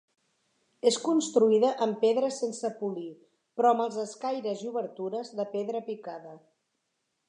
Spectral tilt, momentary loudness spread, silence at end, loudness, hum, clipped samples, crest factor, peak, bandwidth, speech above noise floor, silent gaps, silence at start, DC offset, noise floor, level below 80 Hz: -4.5 dB/octave; 15 LU; 0.9 s; -28 LUFS; none; under 0.1%; 18 dB; -10 dBFS; 11 kHz; 51 dB; none; 0.85 s; under 0.1%; -79 dBFS; -88 dBFS